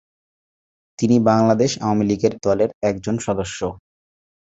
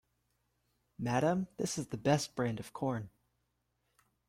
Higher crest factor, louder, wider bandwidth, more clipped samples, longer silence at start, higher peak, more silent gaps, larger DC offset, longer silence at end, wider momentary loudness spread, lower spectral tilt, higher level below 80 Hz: about the same, 18 dB vs 20 dB; first, -19 LUFS vs -35 LUFS; second, 8 kHz vs 16 kHz; neither; about the same, 1 s vs 1 s; first, -2 dBFS vs -16 dBFS; first, 2.74-2.81 s vs none; neither; second, 0.7 s vs 1.2 s; about the same, 9 LU vs 9 LU; about the same, -6 dB/octave vs -5.5 dB/octave; first, -50 dBFS vs -68 dBFS